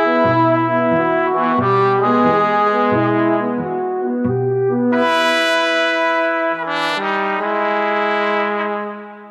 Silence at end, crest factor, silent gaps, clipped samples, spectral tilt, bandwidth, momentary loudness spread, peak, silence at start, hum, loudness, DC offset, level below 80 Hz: 0 s; 12 dB; none; under 0.1%; -6 dB/octave; 13.5 kHz; 6 LU; -4 dBFS; 0 s; none; -16 LUFS; under 0.1%; -62 dBFS